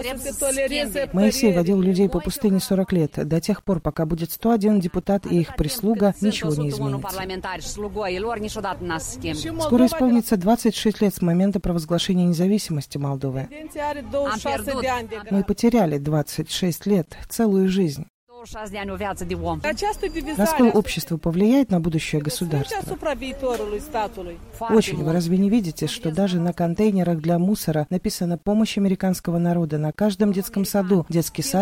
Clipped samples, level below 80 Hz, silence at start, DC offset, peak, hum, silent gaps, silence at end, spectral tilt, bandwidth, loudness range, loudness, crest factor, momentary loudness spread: under 0.1%; -42 dBFS; 0 s; under 0.1%; -4 dBFS; none; 18.10-18.27 s; 0 s; -6 dB/octave; 16.5 kHz; 4 LU; -22 LUFS; 18 dB; 9 LU